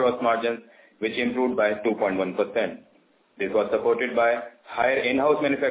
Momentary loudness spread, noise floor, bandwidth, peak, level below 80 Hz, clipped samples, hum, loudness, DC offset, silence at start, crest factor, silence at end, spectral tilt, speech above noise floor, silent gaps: 9 LU; -61 dBFS; 4 kHz; -8 dBFS; -64 dBFS; under 0.1%; none; -24 LUFS; under 0.1%; 0 s; 16 dB; 0 s; -9 dB/octave; 37 dB; none